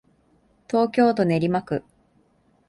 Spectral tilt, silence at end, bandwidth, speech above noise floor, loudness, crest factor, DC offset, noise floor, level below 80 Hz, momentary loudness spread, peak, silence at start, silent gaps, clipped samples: -8 dB/octave; 0.9 s; 11.5 kHz; 42 dB; -22 LUFS; 16 dB; under 0.1%; -62 dBFS; -60 dBFS; 10 LU; -8 dBFS; 0.7 s; none; under 0.1%